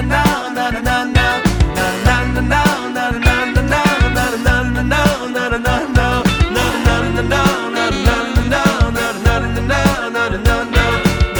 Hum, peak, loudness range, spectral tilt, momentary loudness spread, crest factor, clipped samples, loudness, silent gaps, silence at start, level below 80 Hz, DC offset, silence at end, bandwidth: none; 0 dBFS; 1 LU; -5 dB/octave; 3 LU; 14 dB; under 0.1%; -15 LUFS; none; 0 s; -22 dBFS; under 0.1%; 0 s; over 20 kHz